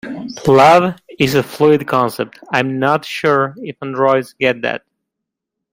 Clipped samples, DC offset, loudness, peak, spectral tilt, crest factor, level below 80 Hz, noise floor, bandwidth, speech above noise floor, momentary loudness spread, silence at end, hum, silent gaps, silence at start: under 0.1%; under 0.1%; -15 LUFS; 0 dBFS; -5.5 dB/octave; 16 dB; -52 dBFS; -80 dBFS; 16.5 kHz; 65 dB; 13 LU; 0.95 s; none; none; 0.05 s